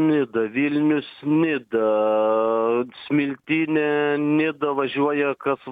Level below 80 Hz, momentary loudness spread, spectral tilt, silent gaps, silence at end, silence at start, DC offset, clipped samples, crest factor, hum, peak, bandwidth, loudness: -70 dBFS; 4 LU; -9 dB/octave; none; 0 s; 0 s; under 0.1%; under 0.1%; 12 dB; none; -10 dBFS; 4.7 kHz; -22 LUFS